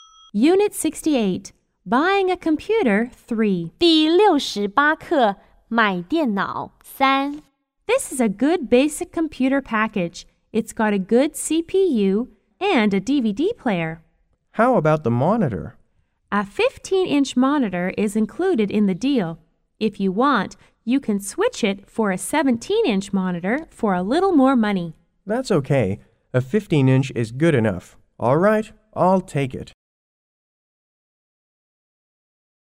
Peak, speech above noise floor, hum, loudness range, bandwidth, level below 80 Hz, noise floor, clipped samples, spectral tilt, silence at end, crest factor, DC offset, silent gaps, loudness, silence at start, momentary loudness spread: -4 dBFS; 44 dB; none; 3 LU; 16 kHz; -52 dBFS; -64 dBFS; under 0.1%; -5.5 dB/octave; 3.1 s; 18 dB; under 0.1%; none; -20 LUFS; 0.35 s; 9 LU